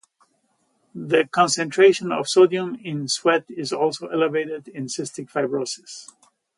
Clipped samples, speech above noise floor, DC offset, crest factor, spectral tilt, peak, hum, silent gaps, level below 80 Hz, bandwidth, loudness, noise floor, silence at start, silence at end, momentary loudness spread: under 0.1%; 47 dB; under 0.1%; 18 dB; -4 dB/octave; -4 dBFS; none; none; -74 dBFS; 11.5 kHz; -21 LUFS; -68 dBFS; 0.95 s; 0.55 s; 15 LU